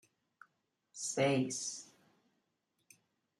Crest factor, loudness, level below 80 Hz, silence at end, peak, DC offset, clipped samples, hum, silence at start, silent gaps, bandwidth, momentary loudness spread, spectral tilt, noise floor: 22 dB; -35 LUFS; -82 dBFS; 1.55 s; -20 dBFS; under 0.1%; under 0.1%; none; 0.95 s; none; 13 kHz; 21 LU; -4 dB/octave; -83 dBFS